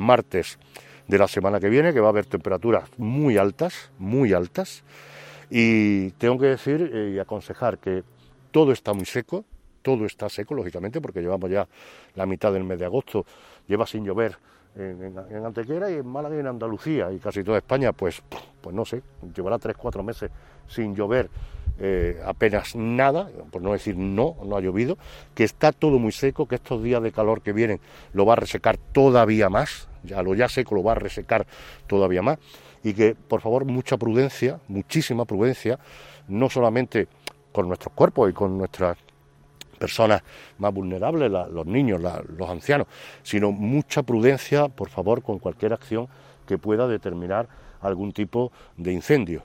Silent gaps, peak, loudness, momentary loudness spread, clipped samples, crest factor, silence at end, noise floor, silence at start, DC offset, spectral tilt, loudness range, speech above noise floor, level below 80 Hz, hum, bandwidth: none; -2 dBFS; -24 LUFS; 13 LU; under 0.1%; 22 dB; 0 s; -55 dBFS; 0 s; under 0.1%; -7 dB/octave; 7 LU; 31 dB; -46 dBFS; none; 16 kHz